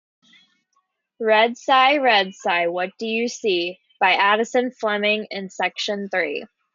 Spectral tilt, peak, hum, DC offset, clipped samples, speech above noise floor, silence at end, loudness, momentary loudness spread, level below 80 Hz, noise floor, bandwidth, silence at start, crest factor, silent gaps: -3 dB/octave; -4 dBFS; none; under 0.1%; under 0.1%; 50 dB; 0.3 s; -20 LUFS; 10 LU; -78 dBFS; -70 dBFS; 7.6 kHz; 1.2 s; 18 dB; none